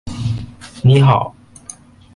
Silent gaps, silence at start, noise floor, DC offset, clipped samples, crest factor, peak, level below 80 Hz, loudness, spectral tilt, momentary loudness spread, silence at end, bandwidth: none; 0.05 s; -39 dBFS; under 0.1%; under 0.1%; 16 dB; 0 dBFS; -40 dBFS; -15 LUFS; -7 dB/octave; 24 LU; 0.85 s; 11 kHz